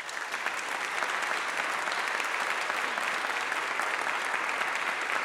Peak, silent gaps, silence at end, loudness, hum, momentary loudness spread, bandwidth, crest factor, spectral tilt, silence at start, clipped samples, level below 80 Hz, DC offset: -12 dBFS; none; 0 s; -30 LUFS; none; 2 LU; 19 kHz; 20 dB; 0 dB/octave; 0 s; under 0.1%; -76 dBFS; under 0.1%